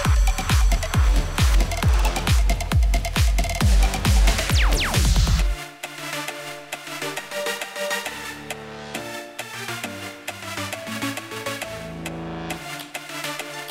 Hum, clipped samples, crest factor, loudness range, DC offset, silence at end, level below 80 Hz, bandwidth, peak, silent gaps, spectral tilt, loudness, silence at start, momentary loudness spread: none; under 0.1%; 16 dB; 9 LU; under 0.1%; 0 s; -24 dBFS; 16 kHz; -6 dBFS; none; -4 dB/octave; -24 LUFS; 0 s; 13 LU